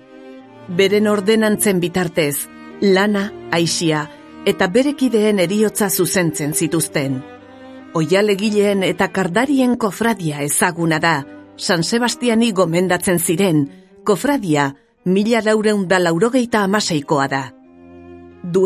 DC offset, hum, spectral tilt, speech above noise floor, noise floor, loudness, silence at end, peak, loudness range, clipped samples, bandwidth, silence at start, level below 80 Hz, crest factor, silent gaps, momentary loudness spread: under 0.1%; none; -4.5 dB/octave; 25 dB; -41 dBFS; -17 LUFS; 0 s; 0 dBFS; 1 LU; under 0.1%; 14.5 kHz; 0.15 s; -54 dBFS; 16 dB; none; 7 LU